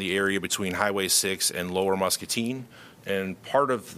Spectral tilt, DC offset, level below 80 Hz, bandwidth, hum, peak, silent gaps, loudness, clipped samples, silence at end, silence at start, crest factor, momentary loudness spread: -2.5 dB/octave; under 0.1%; -64 dBFS; 15.5 kHz; none; -6 dBFS; none; -25 LUFS; under 0.1%; 0 s; 0 s; 20 dB; 10 LU